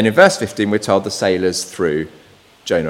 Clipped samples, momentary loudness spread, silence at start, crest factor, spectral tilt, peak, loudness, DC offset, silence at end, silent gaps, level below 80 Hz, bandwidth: 0.1%; 11 LU; 0 s; 16 dB; -4.5 dB/octave; 0 dBFS; -16 LUFS; under 0.1%; 0 s; none; -52 dBFS; 16.5 kHz